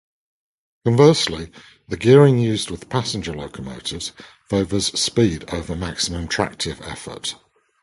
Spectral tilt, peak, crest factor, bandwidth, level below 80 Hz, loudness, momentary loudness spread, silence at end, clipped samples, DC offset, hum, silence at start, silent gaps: -5 dB/octave; 0 dBFS; 20 dB; 11.5 kHz; -42 dBFS; -20 LUFS; 18 LU; 0.5 s; under 0.1%; under 0.1%; none; 0.85 s; none